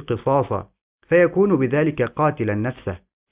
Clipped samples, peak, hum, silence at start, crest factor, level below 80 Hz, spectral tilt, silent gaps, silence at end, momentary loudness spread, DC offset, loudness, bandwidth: under 0.1%; -4 dBFS; none; 0 s; 16 dB; -48 dBFS; -11.5 dB/octave; 0.81-0.98 s; 0.35 s; 13 LU; under 0.1%; -20 LUFS; 3.8 kHz